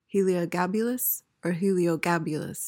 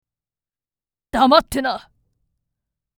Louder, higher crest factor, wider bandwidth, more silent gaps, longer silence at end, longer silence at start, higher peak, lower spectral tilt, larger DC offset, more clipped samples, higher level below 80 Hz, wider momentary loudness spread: second, -27 LUFS vs -17 LUFS; second, 14 dB vs 22 dB; second, 17 kHz vs over 20 kHz; neither; second, 0 s vs 1.2 s; second, 0.15 s vs 1.15 s; second, -12 dBFS vs 0 dBFS; first, -5.5 dB/octave vs -4 dB/octave; neither; neither; second, -70 dBFS vs -46 dBFS; second, 5 LU vs 13 LU